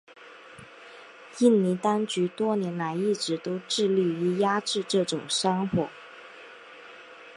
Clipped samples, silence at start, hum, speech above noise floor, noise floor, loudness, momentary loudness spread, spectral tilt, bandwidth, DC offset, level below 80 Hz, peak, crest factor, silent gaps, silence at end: under 0.1%; 0.2 s; none; 22 dB; -48 dBFS; -26 LUFS; 22 LU; -5 dB/octave; 11.5 kHz; under 0.1%; -68 dBFS; -8 dBFS; 18 dB; none; 0 s